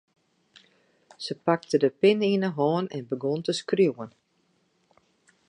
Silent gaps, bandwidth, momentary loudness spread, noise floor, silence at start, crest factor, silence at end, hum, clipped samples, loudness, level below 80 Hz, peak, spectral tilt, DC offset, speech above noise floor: none; 10.5 kHz; 14 LU; -70 dBFS; 1.2 s; 20 dB; 1.4 s; none; under 0.1%; -25 LUFS; -76 dBFS; -8 dBFS; -6 dB/octave; under 0.1%; 45 dB